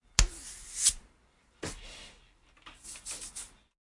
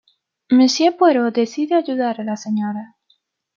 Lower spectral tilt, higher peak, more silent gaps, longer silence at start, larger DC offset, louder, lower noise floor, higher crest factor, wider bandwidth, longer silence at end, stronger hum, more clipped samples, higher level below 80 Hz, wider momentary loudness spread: second, -1 dB/octave vs -4.5 dB/octave; about the same, -2 dBFS vs -4 dBFS; neither; second, 0.2 s vs 0.5 s; neither; second, -32 LUFS vs -18 LUFS; about the same, -66 dBFS vs -63 dBFS; first, 34 dB vs 16 dB; first, 11.5 kHz vs 7.4 kHz; second, 0.5 s vs 0.7 s; neither; neither; first, -40 dBFS vs -74 dBFS; first, 22 LU vs 10 LU